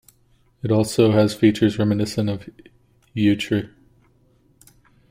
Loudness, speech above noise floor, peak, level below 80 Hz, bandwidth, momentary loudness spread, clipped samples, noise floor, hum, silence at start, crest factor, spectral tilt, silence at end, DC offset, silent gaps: -20 LUFS; 40 dB; -4 dBFS; -52 dBFS; 16 kHz; 15 LU; under 0.1%; -59 dBFS; none; 0.65 s; 18 dB; -6.5 dB/octave; 1.45 s; under 0.1%; none